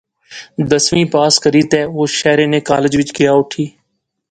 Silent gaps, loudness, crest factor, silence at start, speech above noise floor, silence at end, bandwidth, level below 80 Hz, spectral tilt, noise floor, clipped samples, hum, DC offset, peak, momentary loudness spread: none; -13 LUFS; 14 dB; 0.3 s; 56 dB; 0.6 s; 9.4 kHz; -48 dBFS; -4 dB/octave; -69 dBFS; under 0.1%; none; under 0.1%; 0 dBFS; 12 LU